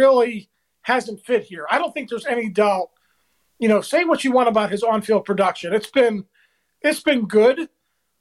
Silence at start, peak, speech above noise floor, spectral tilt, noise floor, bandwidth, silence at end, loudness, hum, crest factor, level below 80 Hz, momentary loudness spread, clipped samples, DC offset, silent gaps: 0 s; -4 dBFS; 48 dB; -5 dB/octave; -67 dBFS; 13 kHz; 0.55 s; -20 LUFS; none; 16 dB; -66 dBFS; 9 LU; under 0.1%; under 0.1%; none